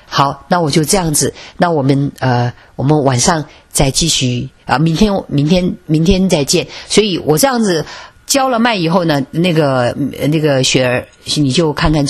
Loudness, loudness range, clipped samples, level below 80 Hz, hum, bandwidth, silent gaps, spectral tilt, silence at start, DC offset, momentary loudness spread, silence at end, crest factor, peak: -13 LUFS; 1 LU; under 0.1%; -32 dBFS; none; 14 kHz; none; -4.5 dB/octave; 0.1 s; under 0.1%; 6 LU; 0 s; 14 dB; 0 dBFS